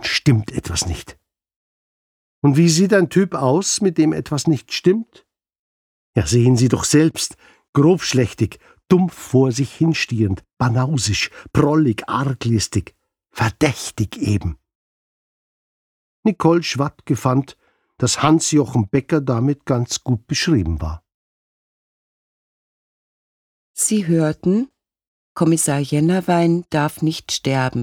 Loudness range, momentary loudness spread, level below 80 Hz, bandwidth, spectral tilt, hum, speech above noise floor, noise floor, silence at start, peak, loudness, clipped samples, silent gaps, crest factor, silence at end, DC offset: 6 LU; 8 LU; -42 dBFS; 17 kHz; -5 dB/octave; none; over 73 dB; under -90 dBFS; 0 s; -2 dBFS; -18 LUFS; under 0.1%; 1.56-2.42 s, 5.59-6.13 s, 7.69-7.73 s, 14.75-16.23 s, 21.14-23.74 s, 25.07-25.35 s; 18 dB; 0 s; under 0.1%